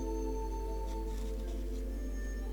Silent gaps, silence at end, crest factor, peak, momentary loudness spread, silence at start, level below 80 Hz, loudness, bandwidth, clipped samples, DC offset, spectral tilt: none; 0 s; 10 dB; -26 dBFS; 3 LU; 0 s; -38 dBFS; -40 LUFS; 19 kHz; under 0.1%; under 0.1%; -6.5 dB/octave